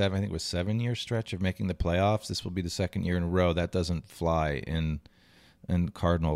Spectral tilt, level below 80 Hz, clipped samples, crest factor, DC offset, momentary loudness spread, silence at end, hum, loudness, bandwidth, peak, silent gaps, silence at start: -6 dB/octave; -46 dBFS; under 0.1%; 16 dB; under 0.1%; 6 LU; 0 s; none; -30 LUFS; 13.5 kHz; -14 dBFS; none; 0 s